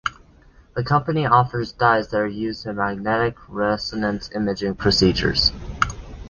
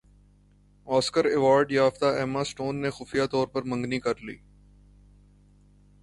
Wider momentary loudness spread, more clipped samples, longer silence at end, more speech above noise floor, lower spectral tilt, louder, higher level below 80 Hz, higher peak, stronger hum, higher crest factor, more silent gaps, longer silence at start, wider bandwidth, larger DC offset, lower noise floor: about the same, 8 LU vs 10 LU; neither; second, 0 s vs 1.65 s; second, 30 dB vs 34 dB; about the same, -5.5 dB/octave vs -5 dB/octave; first, -21 LUFS vs -26 LUFS; first, -40 dBFS vs -58 dBFS; first, 0 dBFS vs -10 dBFS; second, none vs 50 Hz at -50 dBFS; about the same, 20 dB vs 18 dB; neither; second, 0.05 s vs 0.85 s; second, 10 kHz vs 11.5 kHz; neither; second, -50 dBFS vs -59 dBFS